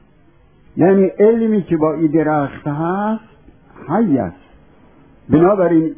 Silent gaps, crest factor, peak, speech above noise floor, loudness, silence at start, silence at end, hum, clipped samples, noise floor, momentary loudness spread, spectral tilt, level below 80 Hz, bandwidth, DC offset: none; 16 dB; 0 dBFS; 37 dB; -15 LUFS; 0.75 s; 0.05 s; none; under 0.1%; -51 dBFS; 10 LU; -13 dB/octave; -48 dBFS; 3.6 kHz; 0.2%